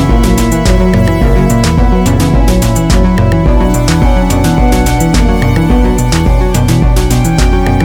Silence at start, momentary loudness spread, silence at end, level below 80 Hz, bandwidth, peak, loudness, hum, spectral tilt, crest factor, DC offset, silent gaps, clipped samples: 0 s; 1 LU; 0 s; -12 dBFS; 17 kHz; 0 dBFS; -10 LUFS; none; -6 dB/octave; 8 dB; under 0.1%; none; 0.4%